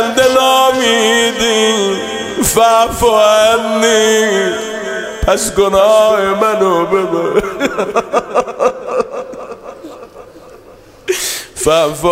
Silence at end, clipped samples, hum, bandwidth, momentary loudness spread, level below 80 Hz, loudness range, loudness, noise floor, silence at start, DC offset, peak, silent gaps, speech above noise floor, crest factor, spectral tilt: 0 s; under 0.1%; none; 16.5 kHz; 11 LU; -36 dBFS; 8 LU; -12 LUFS; -39 dBFS; 0 s; under 0.1%; 0 dBFS; none; 28 dB; 12 dB; -2.5 dB/octave